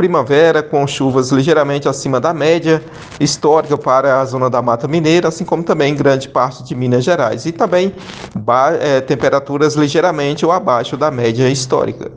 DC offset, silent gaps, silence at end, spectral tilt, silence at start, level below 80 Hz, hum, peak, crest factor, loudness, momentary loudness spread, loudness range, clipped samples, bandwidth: under 0.1%; none; 0 s; -5.5 dB/octave; 0 s; -50 dBFS; none; 0 dBFS; 14 dB; -14 LUFS; 5 LU; 1 LU; under 0.1%; 9.8 kHz